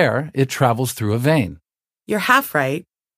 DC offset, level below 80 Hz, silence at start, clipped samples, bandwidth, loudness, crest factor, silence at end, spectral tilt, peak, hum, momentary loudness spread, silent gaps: under 0.1%; -54 dBFS; 0 s; under 0.1%; 15.5 kHz; -19 LUFS; 18 dB; 0.35 s; -5.5 dB/octave; 0 dBFS; none; 9 LU; none